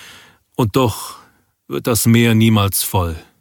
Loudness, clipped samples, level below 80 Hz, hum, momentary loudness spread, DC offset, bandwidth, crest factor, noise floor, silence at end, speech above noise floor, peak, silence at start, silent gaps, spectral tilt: -15 LUFS; under 0.1%; -42 dBFS; none; 16 LU; under 0.1%; 19 kHz; 16 dB; -44 dBFS; 0.2 s; 29 dB; 0 dBFS; 0 s; none; -5 dB/octave